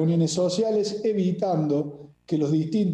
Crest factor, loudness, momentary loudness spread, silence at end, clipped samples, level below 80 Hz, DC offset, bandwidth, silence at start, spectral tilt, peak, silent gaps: 10 dB; -24 LUFS; 5 LU; 0 s; under 0.1%; -64 dBFS; under 0.1%; 9.8 kHz; 0 s; -7 dB/octave; -12 dBFS; none